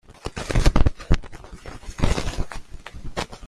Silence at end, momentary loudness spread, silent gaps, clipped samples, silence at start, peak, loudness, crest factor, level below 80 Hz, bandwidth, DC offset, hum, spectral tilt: 0 s; 19 LU; none; under 0.1%; 0.1 s; -2 dBFS; -26 LUFS; 20 dB; -26 dBFS; 12 kHz; under 0.1%; none; -5.5 dB/octave